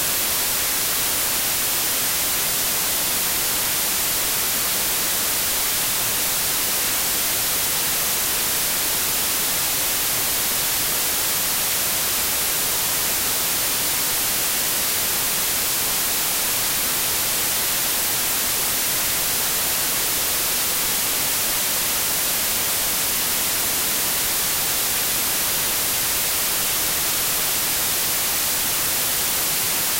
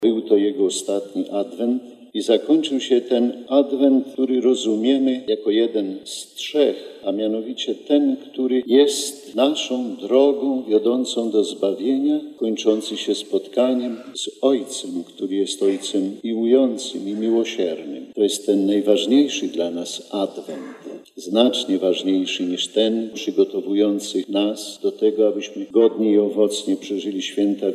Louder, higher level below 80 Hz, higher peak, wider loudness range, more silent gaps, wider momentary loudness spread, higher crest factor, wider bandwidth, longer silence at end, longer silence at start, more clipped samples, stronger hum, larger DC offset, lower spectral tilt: first, -18 LUFS vs -21 LUFS; first, -46 dBFS vs -82 dBFS; second, -10 dBFS vs -2 dBFS; second, 0 LU vs 3 LU; neither; second, 0 LU vs 10 LU; second, 12 dB vs 18 dB; first, 16 kHz vs 13.5 kHz; about the same, 0 s vs 0 s; about the same, 0 s vs 0 s; neither; neither; neither; second, 0 dB/octave vs -4 dB/octave